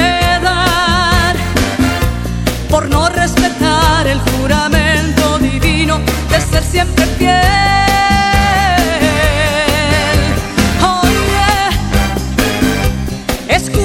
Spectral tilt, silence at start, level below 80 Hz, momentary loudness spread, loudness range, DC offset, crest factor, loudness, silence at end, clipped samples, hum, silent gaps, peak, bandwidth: -4.5 dB/octave; 0 s; -20 dBFS; 5 LU; 2 LU; under 0.1%; 12 dB; -12 LUFS; 0 s; under 0.1%; none; none; 0 dBFS; 17 kHz